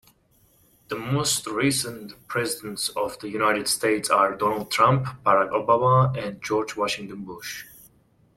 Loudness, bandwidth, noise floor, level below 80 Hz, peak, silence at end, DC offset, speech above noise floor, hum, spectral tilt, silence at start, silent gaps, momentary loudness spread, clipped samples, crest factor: -23 LUFS; 16.5 kHz; -61 dBFS; -58 dBFS; -6 dBFS; 0.7 s; under 0.1%; 37 dB; none; -4 dB/octave; 0.9 s; none; 14 LU; under 0.1%; 20 dB